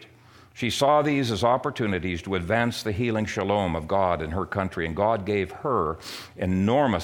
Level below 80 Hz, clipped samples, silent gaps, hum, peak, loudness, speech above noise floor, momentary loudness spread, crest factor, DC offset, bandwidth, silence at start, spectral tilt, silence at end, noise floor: -48 dBFS; under 0.1%; none; none; -8 dBFS; -25 LUFS; 28 dB; 7 LU; 18 dB; under 0.1%; 18 kHz; 0 s; -6 dB/octave; 0 s; -52 dBFS